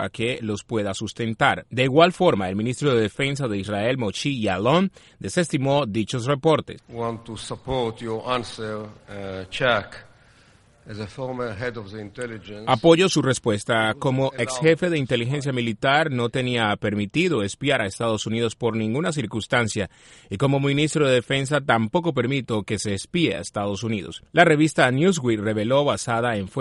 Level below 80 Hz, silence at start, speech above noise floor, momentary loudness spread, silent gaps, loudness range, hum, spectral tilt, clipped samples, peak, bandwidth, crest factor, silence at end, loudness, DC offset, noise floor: -54 dBFS; 0 s; 32 dB; 13 LU; none; 7 LU; none; -5 dB/octave; under 0.1%; -2 dBFS; 11.5 kHz; 22 dB; 0 s; -22 LUFS; under 0.1%; -55 dBFS